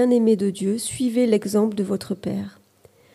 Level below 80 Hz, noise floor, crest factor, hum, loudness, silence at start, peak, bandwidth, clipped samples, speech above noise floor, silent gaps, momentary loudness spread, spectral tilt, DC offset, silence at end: -62 dBFS; -55 dBFS; 14 dB; none; -22 LUFS; 0 s; -8 dBFS; 14.5 kHz; under 0.1%; 34 dB; none; 10 LU; -6 dB/octave; under 0.1%; 0.65 s